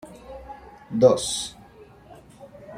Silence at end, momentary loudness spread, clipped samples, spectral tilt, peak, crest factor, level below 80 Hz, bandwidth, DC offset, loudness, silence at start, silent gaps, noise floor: 0 s; 25 LU; under 0.1%; -4.5 dB/octave; -4 dBFS; 22 dB; -54 dBFS; 15 kHz; under 0.1%; -22 LUFS; 0.05 s; none; -49 dBFS